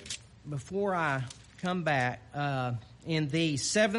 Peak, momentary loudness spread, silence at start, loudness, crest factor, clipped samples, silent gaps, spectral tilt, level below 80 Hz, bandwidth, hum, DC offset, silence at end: -14 dBFS; 12 LU; 0 s; -32 LUFS; 18 dB; under 0.1%; none; -4.5 dB/octave; -62 dBFS; 11.5 kHz; none; under 0.1%; 0 s